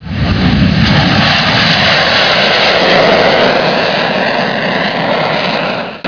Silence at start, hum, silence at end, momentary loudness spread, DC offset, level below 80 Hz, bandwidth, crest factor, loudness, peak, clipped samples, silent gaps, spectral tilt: 0 s; none; 0 s; 5 LU; 0.5%; -28 dBFS; 5.4 kHz; 10 dB; -9 LUFS; 0 dBFS; 0.5%; none; -5.5 dB/octave